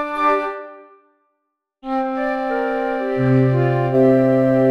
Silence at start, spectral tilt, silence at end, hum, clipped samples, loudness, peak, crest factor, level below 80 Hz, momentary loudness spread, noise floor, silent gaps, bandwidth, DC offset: 0 s; -9.5 dB/octave; 0 s; none; under 0.1%; -18 LUFS; -4 dBFS; 14 dB; -50 dBFS; 12 LU; -75 dBFS; none; 5.8 kHz; under 0.1%